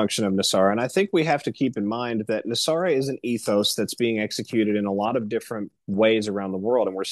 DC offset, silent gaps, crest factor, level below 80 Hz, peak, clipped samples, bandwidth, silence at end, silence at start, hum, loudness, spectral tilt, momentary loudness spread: under 0.1%; none; 18 dB; -68 dBFS; -6 dBFS; under 0.1%; 12.5 kHz; 0 s; 0 s; none; -23 LUFS; -4.5 dB/octave; 7 LU